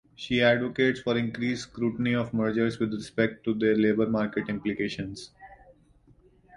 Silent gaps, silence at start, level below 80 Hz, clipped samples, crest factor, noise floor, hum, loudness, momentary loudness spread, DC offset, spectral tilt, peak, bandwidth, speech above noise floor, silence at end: none; 0.2 s; -58 dBFS; under 0.1%; 20 dB; -59 dBFS; none; -27 LUFS; 8 LU; under 0.1%; -6.5 dB/octave; -8 dBFS; 11 kHz; 33 dB; 0 s